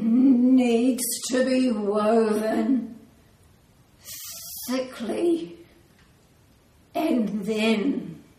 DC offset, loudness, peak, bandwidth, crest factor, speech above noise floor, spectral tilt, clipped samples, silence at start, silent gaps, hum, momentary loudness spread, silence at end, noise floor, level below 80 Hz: under 0.1%; -23 LUFS; -10 dBFS; 15.5 kHz; 14 dB; 34 dB; -4.5 dB/octave; under 0.1%; 0 s; none; none; 16 LU; 0.2 s; -57 dBFS; -64 dBFS